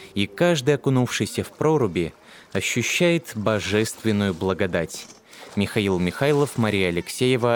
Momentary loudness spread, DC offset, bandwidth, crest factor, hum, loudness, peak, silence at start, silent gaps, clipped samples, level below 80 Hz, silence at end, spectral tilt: 8 LU; under 0.1%; 19.5 kHz; 16 dB; none; -23 LUFS; -6 dBFS; 0 s; none; under 0.1%; -54 dBFS; 0 s; -5 dB/octave